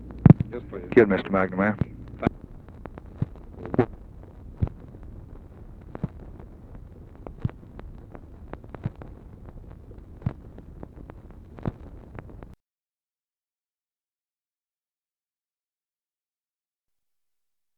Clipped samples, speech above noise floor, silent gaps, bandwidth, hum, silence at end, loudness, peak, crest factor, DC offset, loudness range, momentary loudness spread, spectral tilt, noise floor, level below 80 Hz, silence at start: under 0.1%; over 68 dB; none; 4.7 kHz; none; 5.35 s; -26 LUFS; 0 dBFS; 30 dB; under 0.1%; 17 LU; 26 LU; -10.5 dB/octave; under -90 dBFS; -44 dBFS; 0 s